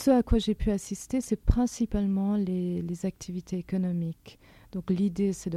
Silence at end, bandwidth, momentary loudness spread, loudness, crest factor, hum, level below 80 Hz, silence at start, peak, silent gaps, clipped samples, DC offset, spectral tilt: 0 s; 13.5 kHz; 9 LU; -29 LUFS; 22 dB; none; -36 dBFS; 0 s; -6 dBFS; none; under 0.1%; under 0.1%; -7 dB/octave